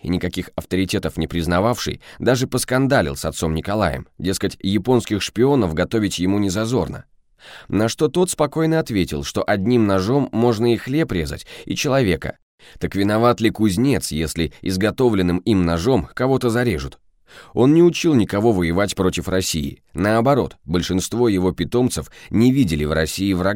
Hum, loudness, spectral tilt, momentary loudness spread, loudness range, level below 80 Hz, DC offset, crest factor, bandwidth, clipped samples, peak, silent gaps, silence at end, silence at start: none; -19 LUFS; -5.5 dB/octave; 8 LU; 2 LU; -40 dBFS; under 0.1%; 16 dB; 17 kHz; under 0.1%; -4 dBFS; 12.42-12.58 s; 0 s; 0.05 s